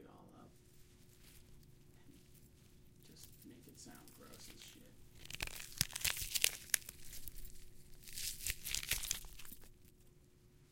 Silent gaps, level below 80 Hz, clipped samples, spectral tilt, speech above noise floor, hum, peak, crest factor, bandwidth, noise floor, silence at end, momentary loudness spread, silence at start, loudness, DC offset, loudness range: none; -58 dBFS; under 0.1%; -0.5 dB/octave; 9 dB; none; -6 dBFS; 40 dB; 17 kHz; -66 dBFS; 0 s; 26 LU; 0 s; -40 LUFS; under 0.1%; 21 LU